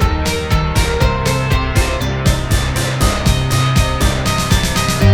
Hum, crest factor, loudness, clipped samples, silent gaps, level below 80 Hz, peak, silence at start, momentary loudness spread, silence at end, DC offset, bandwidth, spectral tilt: none; 14 dB; -15 LUFS; under 0.1%; none; -20 dBFS; 0 dBFS; 0 s; 2 LU; 0 s; under 0.1%; 19 kHz; -4.5 dB/octave